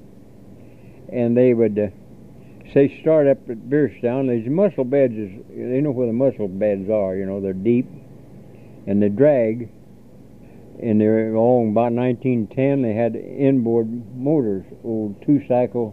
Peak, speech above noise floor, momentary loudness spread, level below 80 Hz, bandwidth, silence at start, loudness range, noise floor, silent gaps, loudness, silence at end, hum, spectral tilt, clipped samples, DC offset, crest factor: -2 dBFS; 26 dB; 10 LU; -58 dBFS; 4.2 kHz; 0.45 s; 3 LU; -45 dBFS; none; -20 LUFS; 0 s; none; -10.5 dB/octave; under 0.1%; 0.4%; 18 dB